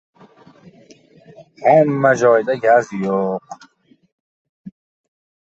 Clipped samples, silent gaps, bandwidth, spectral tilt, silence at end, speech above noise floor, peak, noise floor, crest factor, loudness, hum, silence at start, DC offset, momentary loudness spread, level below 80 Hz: under 0.1%; 4.12-4.64 s; 8 kHz; -6.5 dB/octave; 0.9 s; 33 dB; -2 dBFS; -48 dBFS; 18 dB; -16 LUFS; none; 1.4 s; under 0.1%; 11 LU; -64 dBFS